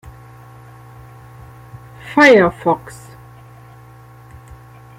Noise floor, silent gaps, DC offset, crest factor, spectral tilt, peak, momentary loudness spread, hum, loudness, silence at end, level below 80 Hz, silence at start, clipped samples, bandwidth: -41 dBFS; none; under 0.1%; 18 dB; -5.5 dB/octave; 0 dBFS; 30 LU; none; -13 LUFS; 2.2 s; -48 dBFS; 2.05 s; under 0.1%; 16 kHz